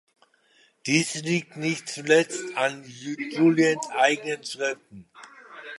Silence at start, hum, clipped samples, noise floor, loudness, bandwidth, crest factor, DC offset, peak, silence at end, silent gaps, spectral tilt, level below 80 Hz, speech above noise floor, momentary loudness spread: 0.85 s; none; under 0.1%; -62 dBFS; -24 LUFS; 11.5 kHz; 20 dB; under 0.1%; -6 dBFS; 0 s; none; -4 dB/octave; -76 dBFS; 37 dB; 15 LU